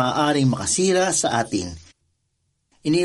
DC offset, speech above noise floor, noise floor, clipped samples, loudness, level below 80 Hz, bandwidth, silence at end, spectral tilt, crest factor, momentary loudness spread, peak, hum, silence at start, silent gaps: under 0.1%; 51 dB; -72 dBFS; under 0.1%; -20 LUFS; -52 dBFS; 11.5 kHz; 0 s; -4 dB/octave; 14 dB; 10 LU; -8 dBFS; none; 0 s; none